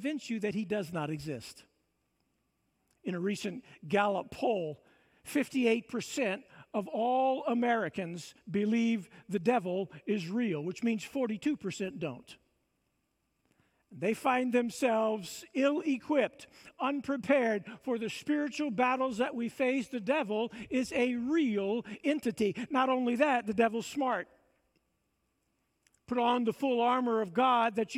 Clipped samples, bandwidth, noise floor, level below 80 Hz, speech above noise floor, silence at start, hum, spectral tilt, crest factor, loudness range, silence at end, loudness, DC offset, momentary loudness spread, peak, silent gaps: under 0.1%; 15.5 kHz; -79 dBFS; -74 dBFS; 48 dB; 0 s; none; -5.5 dB/octave; 18 dB; 5 LU; 0 s; -32 LUFS; under 0.1%; 10 LU; -14 dBFS; none